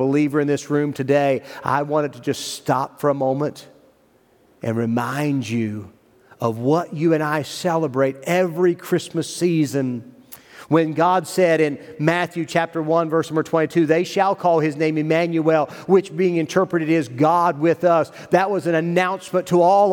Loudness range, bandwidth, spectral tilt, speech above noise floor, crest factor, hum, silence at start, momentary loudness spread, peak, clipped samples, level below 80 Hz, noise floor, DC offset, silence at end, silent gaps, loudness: 5 LU; 18.5 kHz; -6 dB/octave; 38 dB; 18 dB; none; 0 s; 7 LU; -2 dBFS; under 0.1%; -68 dBFS; -57 dBFS; under 0.1%; 0 s; none; -20 LUFS